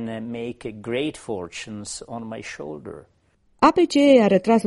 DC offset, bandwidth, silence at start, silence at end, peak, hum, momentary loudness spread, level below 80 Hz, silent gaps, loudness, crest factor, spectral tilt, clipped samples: under 0.1%; 11.5 kHz; 0 s; 0 s; -2 dBFS; none; 19 LU; -56 dBFS; none; -20 LUFS; 20 dB; -5.5 dB/octave; under 0.1%